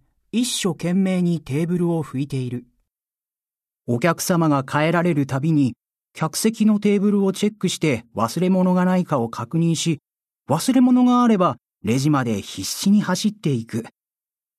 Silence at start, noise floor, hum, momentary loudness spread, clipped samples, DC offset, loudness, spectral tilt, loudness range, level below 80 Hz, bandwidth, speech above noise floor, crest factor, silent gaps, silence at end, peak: 0.35 s; under -90 dBFS; none; 9 LU; under 0.1%; under 0.1%; -20 LUFS; -6 dB/octave; 5 LU; -60 dBFS; 14 kHz; over 71 dB; 16 dB; none; 0.7 s; -4 dBFS